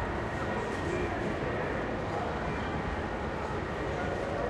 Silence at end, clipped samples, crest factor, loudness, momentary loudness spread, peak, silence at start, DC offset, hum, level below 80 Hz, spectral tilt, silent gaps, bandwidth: 0 s; under 0.1%; 14 dB; -33 LUFS; 2 LU; -18 dBFS; 0 s; under 0.1%; none; -44 dBFS; -6.5 dB/octave; none; 12.5 kHz